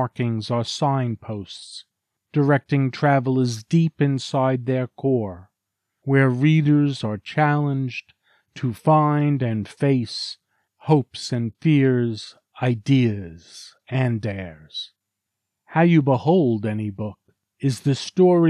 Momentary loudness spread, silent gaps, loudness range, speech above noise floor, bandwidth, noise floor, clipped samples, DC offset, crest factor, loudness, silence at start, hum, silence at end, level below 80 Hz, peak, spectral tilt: 16 LU; none; 3 LU; 61 dB; 10.5 kHz; -82 dBFS; under 0.1%; under 0.1%; 16 dB; -21 LUFS; 0 s; none; 0 s; -64 dBFS; -4 dBFS; -7 dB/octave